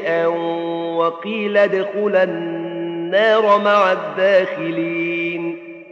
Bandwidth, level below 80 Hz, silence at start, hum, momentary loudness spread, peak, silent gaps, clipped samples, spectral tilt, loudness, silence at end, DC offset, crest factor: 7.2 kHz; -78 dBFS; 0 s; none; 11 LU; 0 dBFS; none; under 0.1%; -6.5 dB/octave; -18 LUFS; 0.05 s; under 0.1%; 18 dB